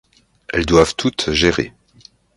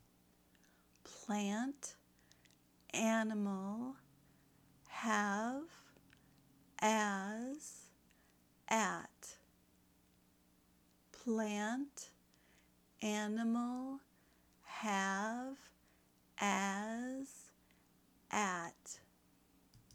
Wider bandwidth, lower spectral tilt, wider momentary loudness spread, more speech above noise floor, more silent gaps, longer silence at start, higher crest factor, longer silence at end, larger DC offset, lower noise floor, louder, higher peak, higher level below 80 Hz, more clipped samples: second, 11.5 kHz vs over 20 kHz; about the same, -4.5 dB/octave vs -4 dB/octave; second, 10 LU vs 19 LU; about the same, 33 dB vs 33 dB; neither; second, 0.55 s vs 1.05 s; second, 18 dB vs 24 dB; first, 0.65 s vs 0.15 s; neither; second, -49 dBFS vs -72 dBFS; first, -17 LUFS vs -40 LUFS; first, 0 dBFS vs -18 dBFS; first, -36 dBFS vs -80 dBFS; neither